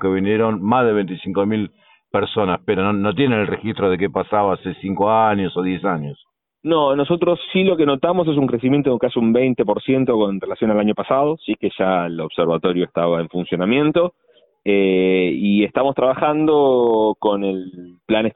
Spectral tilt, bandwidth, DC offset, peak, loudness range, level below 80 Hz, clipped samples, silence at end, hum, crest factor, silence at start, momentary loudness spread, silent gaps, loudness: -11.5 dB/octave; 4.1 kHz; under 0.1%; -2 dBFS; 3 LU; -54 dBFS; under 0.1%; 0.05 s; none; 14 dB; 0 s; 7 LU; none; -18 LUFS